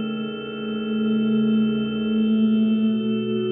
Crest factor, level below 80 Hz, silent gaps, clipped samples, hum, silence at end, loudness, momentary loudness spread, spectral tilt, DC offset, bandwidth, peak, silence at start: 10 dB; -58 dBFS; none; under 0.1%; none; 0 s; -22 LUFS; 9 LU; -10.5 dB/octave; under 0.1%; 3.7 kHz; -12 dBFS; 0 s